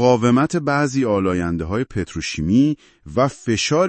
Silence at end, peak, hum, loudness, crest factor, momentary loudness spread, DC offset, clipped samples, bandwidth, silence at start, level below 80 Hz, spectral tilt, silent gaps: 0 s; -2 dBFS; none; -19 LUFS; 16 dB; 9 LU; under 0.1%; under 0.1%; 8.8 kHz; 0 s; -46 dBFS; -5.5 dB/octave; none